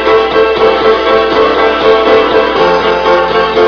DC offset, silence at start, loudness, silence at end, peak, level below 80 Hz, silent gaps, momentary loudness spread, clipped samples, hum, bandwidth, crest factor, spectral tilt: under 0.1%; 0 s; -8 LUFS; 0 s; 0 dBFS; -34 dBFS; none; 2 LU; 1%; none; 5.4 kHz; 8 dB; -5 dB/octave